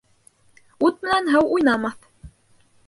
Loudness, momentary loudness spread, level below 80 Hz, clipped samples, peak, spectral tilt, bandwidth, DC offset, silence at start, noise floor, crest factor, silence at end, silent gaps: -20 LUFS; 6 LU; -54 dBFS; under 0.1%; -6 dBFS; -5 dB/octave; 11.5 kHz; under 0.1%; 0.8 s; -58 dBFS; 18 dB; 0.6 s; none